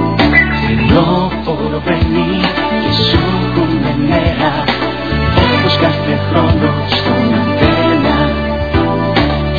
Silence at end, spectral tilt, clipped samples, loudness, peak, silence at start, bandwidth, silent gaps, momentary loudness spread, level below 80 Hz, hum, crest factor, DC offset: 0 s; -8 dB/octave; under 0.1%; -12 LUFS; 0 dBFS; 0 s; 5.4 kHz; none; 5 LU; -24 dBFS; none; 12 dB; 1%